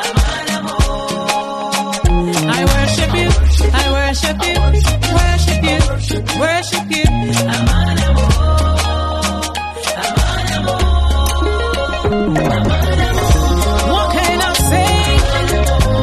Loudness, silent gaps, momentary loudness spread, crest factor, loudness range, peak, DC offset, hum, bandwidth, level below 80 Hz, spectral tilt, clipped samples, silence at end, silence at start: -15 LUFS; none; 5 LU; 14 dB; 2 LU; 0 dBFS; under 0.1%; none; 13.5 kHz; -16 dBFS; -4.5 dB/octave; under 0.1%; 0 s; 0 s